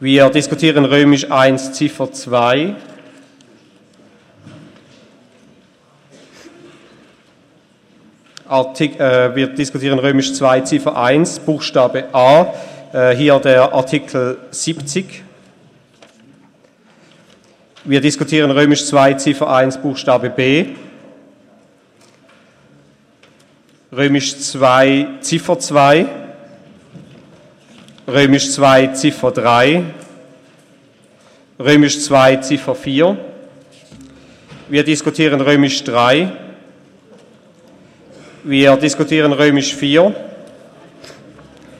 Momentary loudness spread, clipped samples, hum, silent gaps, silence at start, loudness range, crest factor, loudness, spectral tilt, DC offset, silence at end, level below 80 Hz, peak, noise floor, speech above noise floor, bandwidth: 11 LU; under 0.1%; none; none; 0 s; 9 LU; 16 dB; -13 LUFS; -4.5 dB/octave; under 0.1%; 0.7 s; -56 dBFS; 0 dBFS; -51 dBFS; 38 dB; 12.5 kHz